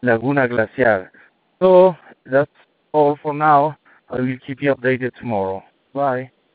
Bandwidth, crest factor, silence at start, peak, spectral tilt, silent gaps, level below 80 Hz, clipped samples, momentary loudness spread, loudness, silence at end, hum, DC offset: 4.7 kHz; 18 dB; 0.05 s; 0 dBFS; -5.5 dB/octave; none; -60 dBFS; under 0.1%; 13 LU; -18 LUFS; 0.3 s; none; under 0.1%